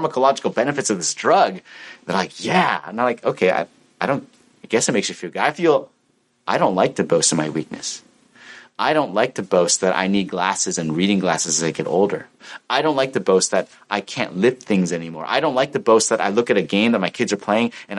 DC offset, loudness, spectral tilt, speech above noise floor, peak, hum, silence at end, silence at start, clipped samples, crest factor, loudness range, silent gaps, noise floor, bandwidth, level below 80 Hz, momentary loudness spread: under 0.1%; -19 LUFS; -3.5 dB/octave; 44 dB; -2 dBFS; none; 0 s; 0 s; under 0.1%; 18 dB; 2 LU; none; -64 dBFS; 11.5 kHz; -66 dBFS; 9 LU